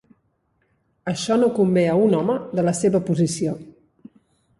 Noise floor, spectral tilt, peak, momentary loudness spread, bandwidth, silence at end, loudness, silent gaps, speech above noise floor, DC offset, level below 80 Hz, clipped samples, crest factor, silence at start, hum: -68 dBFS; -6 dB/octave; -6 dBFS; 10 LU; 11.5 kHz; 0.9 s; -20 LUFS; none; 48 dB; under 0.1%; -60 dBFS; under 0.1%; 16 dB; 1.05 s; none